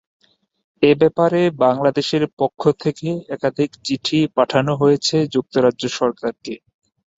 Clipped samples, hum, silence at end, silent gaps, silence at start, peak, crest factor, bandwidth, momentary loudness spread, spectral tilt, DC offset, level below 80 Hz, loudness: under 0.1%; none; 0.65 s; 2.33-2.37 s; 0.8 s; -2 dBFS; 18 dB; 8 kHz; 10 LU; -5.5 dB/octave; under 0.1%; -60 dBFS; -18 LUFS